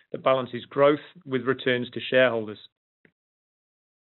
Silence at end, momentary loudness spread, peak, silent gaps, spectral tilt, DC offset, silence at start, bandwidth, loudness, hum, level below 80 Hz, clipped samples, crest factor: 1.65 s; 10 LU; -8 dBFS; none; -3 dB/octave; under 0.1%; 0.15 s; 4.2 kHz; -25 LUFS; none; -78 dBFS; under 0.1%; 20 dB